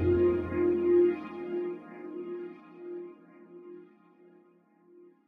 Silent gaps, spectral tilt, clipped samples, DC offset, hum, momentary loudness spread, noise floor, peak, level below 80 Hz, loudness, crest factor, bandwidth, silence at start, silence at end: none; -10.5 dB/octave; under 0.1%; under 0.1%; none; 24 LU; -63 dBFS; -16 dBFS; -56 dBFS; -29 LUFS; 16 dB; 3.7 kHz; 0 s; 1.45 s